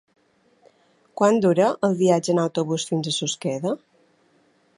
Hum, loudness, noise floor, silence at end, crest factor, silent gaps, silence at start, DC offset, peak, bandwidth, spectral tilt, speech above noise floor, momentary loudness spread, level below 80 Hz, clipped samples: none; -22 LUFS; -62 dBFS; 1 s; 20 dB; none; 1.15 s; under 0.1%; -4 dBFS; 11.5 kHz; -5 dB/octave; 41 dB; 9 LU; -70 dBFS; under 0.1%